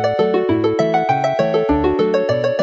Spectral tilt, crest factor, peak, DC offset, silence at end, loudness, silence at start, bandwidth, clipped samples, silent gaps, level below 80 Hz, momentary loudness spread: -7 dB/octave; 12 dB; -4 dBFS; under 0.1%; 0 s; -17 LUFS; 0 s; 7.8 kHz; under 0.1%; none; -38 dBFS; 1 LU